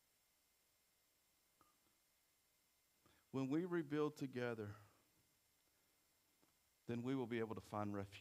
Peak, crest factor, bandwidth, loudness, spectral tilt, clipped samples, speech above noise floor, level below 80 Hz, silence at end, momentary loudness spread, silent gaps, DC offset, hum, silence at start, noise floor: -30 dBFS; 20 dB; 15.5 kHz; -46 LUFS; -7 dB/octave; under 0.1%; 36 dB; -86 dBFS; 0 s; 9 LU; none; under 0.1%; none; 3.35 s; -81 dBFS